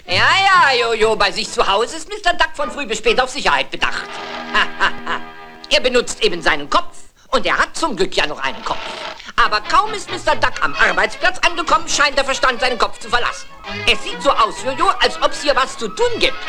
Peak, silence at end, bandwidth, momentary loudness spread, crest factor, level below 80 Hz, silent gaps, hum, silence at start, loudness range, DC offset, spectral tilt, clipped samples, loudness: 0 dBFS; 0 s; 12.5 kHz; 9 LU; 16 dB; -34 dBFS; none; none; 0.05 s; 3 LU; under 0.1%; -2 dB/octave; under 0.1%; -17 LUFS